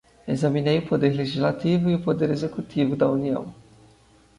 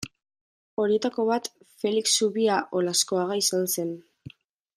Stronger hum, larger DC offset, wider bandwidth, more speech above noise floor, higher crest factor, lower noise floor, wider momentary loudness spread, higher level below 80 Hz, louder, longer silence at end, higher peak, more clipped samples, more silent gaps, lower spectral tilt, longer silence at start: neither; neither; second, 11 kHz vs 15.5 kHz; first, 33 dB vs 23 dB; about the same, 16 dB vs 18 dB; first, -55 dBFS vs -48 dBFS; second, 7 LU vs 13 LU; first, -56 dBFS vs -70 dBFS; about the same, -23 LUFS vs -25 LUFS; first, 0.85 s vs 0.5 s; about the same, -8 dBFS vs -8 dBFS; neither; second, none vs 0.41-0.77 s; first, -8 dB/octave vs -3 dB/octave; first, 0.25 s vs 0 s